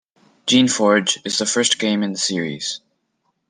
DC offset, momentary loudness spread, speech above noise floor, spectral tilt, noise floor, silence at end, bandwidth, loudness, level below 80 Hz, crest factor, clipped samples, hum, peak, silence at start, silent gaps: under 0.1%; 11 LU; 52 dB; -2.5 dB/octave; -70 dBFS; 0.7 s; 10 kHz; -18 LUFS; -66 dBFS; 18 dB; under 0.1%; none; -2 dBFS; 0.45 s; none